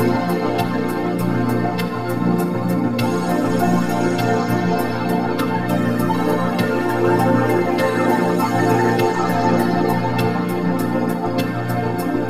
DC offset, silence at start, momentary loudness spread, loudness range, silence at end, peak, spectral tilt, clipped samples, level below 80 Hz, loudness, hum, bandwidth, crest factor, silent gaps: 2%; 0 s; 4 LU; 2 LU; 0 s; -4 dBFS; -7 dB/octave; under 0.1%; -48 dBFS; -19 LUFS; 60 Hz at -35 dBFS; 16 kHz; 14 dB; none